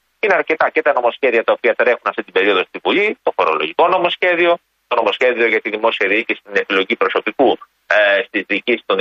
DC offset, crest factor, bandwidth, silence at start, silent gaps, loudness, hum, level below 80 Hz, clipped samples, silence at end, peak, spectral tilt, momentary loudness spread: under 0.1%; 14 dB; 7.2 kHz; 0.25 s; none; -16 LUFS; none; -66 dBFS; under 0.1%; 0 s; -2 dBFS; -4.5 dB/octave; 4 LU